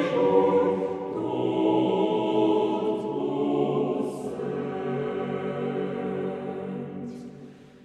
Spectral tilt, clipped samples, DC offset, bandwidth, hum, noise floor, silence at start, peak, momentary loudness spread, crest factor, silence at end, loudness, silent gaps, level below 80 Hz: -8 dB/octave; under 0.1%; under 0.1%; 11 kHz; none; -46 dBFS; 0 s; -8 dBFS; 12 LU; 18 dB; 0 s; -26 LUFS; none; -68 dBFS